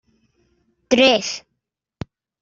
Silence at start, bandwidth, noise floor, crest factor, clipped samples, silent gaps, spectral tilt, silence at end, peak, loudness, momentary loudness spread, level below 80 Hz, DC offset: 0.9 s; 7.8 kHz; -78 dBFS; 20 dB; under 0.1%; none; -3 dB/octave; 1.05 s; -2 dBFS; -17 LUFS; 23 LU; -56 dBFS; under 0.1%